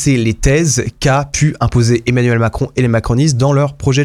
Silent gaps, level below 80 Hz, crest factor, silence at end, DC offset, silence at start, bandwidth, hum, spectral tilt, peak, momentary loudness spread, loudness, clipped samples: none; -28 dBFS; 12 dB; 0 s; under 0.1%; 0 s; 14 kHz; none; -5.5 dB/octave; 0 dBFS; 3 LU; -13 LUFS; under 0.1%